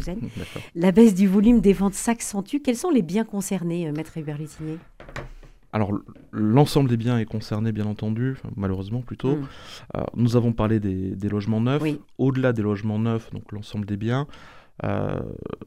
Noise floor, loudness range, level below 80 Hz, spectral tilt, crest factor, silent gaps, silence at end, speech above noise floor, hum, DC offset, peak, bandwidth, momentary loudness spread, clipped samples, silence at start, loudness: -43 dBFS; 7 LU; -44 dBFS; -7 dB/octave; 20 dB; none; 0 s; 20 dB; none; 0.2%; -2 dBFS; 15.5 kHz; 16 LU; under 0.1%; 0 s; -23 LUFS